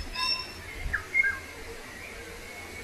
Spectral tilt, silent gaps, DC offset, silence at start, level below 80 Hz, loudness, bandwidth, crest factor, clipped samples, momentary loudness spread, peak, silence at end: -2 dB/octave; none; under 0.1%; 0 s; -46 dBFS; -30 LUFS; 14.5 kHz; 20 dB; under 0.1%; 16 LU; -12 dBFS; 0 s